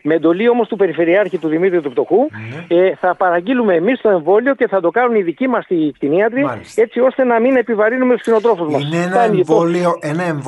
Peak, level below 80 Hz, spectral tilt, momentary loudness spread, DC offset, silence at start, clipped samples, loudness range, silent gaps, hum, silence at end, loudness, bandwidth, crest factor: -2 dBFS; -62 dBFS; -7 dB/octave; 4 LU; under 0.1%; 0.05 s; under 0.1%; 1 LU; none; none; 0 s; -15 LUFS; 11.5 kHz; 12 dB